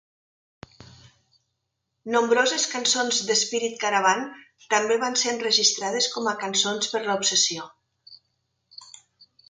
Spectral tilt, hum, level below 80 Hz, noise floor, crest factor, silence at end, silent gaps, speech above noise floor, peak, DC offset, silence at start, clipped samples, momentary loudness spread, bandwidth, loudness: -0.5 dB/octave; none; -70 dBFS; -79 dBFS; 20 dB; 0.6 s; none; 55 dB; -6 dBFS; under 0.1%; 0.8 s; under 0.1%; 8 LU; 10 kHz; -22 LUFS